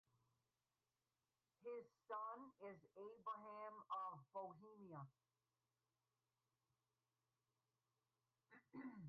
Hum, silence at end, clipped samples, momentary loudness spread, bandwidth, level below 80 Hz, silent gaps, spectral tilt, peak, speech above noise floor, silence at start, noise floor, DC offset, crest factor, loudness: none; 0 s; under 0.1%; 10 LU; 4.6 kHz; under -90 dBFS; none; -5.5 dB/octave; -42 dBFS; over 34 dB; 1.6 s; under -90 dBFS; under 0.1%; 18 dB; -56 LUFS